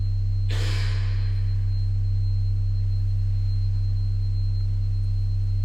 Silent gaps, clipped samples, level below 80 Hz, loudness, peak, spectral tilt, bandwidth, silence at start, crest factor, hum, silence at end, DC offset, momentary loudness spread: none; under 0.1%; -26 dBFS; -26 LUFS; -14 dBFS; -6.5 dB/octave; 7.8 kHz; 0 s; 8 dB; none; 0 s; under 0.1%; 1 LU